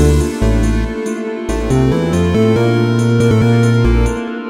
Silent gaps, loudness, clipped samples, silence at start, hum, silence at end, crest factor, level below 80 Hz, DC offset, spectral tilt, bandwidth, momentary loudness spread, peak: none; -14 LUFS; under 0.1%; 0 s; none; 0 s; 12 dB; -20 dBFS; under 0.1%; -7 dB/octave; 13.5 kHz; 8 LU; 0 dBFS